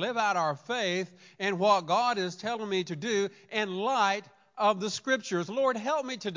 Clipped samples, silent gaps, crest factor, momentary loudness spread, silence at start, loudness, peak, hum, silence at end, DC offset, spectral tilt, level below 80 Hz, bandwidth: under 0.1%; none; 18 dB; 7 LU; 0 s; -29 LUFS; -12 dBFS; none; 0 s; under 0.1%; -4 dB/octave; -84 dBFS; 7.6 kHz